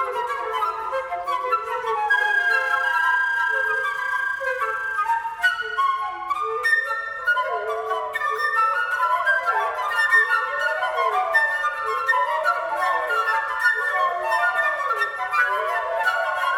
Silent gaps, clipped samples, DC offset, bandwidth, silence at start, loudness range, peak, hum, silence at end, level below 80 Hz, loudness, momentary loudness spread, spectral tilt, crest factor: none; under 0.1%; under 0.1%; over 20 kHz; 0 s; 2 LU; -6 dBFS; none; 0 s; -64 dBFS; -21 LUFS; 6 LU; -0.5 dB/octave; 16 dB